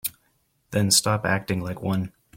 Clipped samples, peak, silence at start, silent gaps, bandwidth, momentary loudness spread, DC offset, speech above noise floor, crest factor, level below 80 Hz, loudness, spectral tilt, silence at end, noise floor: under 0.1%; -6 dBFS; 0.05 s; none; 16.5 kHz; 10 LU; under 0.1%; 44 dB; 20 dB; -56 dBFS; -23 LUFS; -3.5 dB/octave; 0.3 s; -68 dBFS